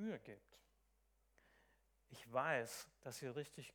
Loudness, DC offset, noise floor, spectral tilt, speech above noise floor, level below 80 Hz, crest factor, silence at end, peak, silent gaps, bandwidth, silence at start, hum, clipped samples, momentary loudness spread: -46 LUFS; under 0.1%; -79 dBFS; -4 dB/octave; 32 dB; -80 dBFS; 24 dB; 0.05 s; -26 dBFS; none; 19.5 kHz; 0 s; none; under 0.1%; 21 LU